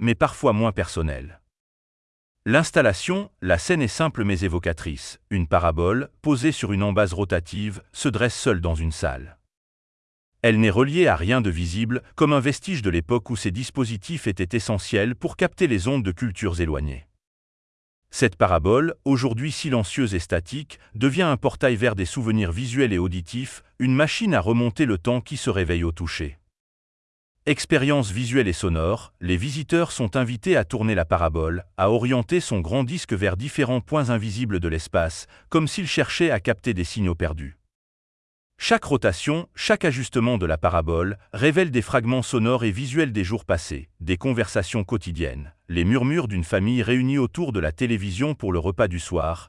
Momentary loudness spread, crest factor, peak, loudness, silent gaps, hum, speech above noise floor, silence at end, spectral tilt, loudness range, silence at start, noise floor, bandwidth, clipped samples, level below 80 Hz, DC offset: 8 LU; 18 dB; -4 dBFS; -23 LUFS; 1.60-2.35 s, 9.57-10.32 s, 17.27-18.02 s, 26.60-27.35 s, 37.75-38.50 s; none; over 68 dB; 0.05 s; -6 dB/octave; 3 LU; 0 s; under -90 dBFS; 12 kHz; under 0.1%; -42 dBFS; under 0.1%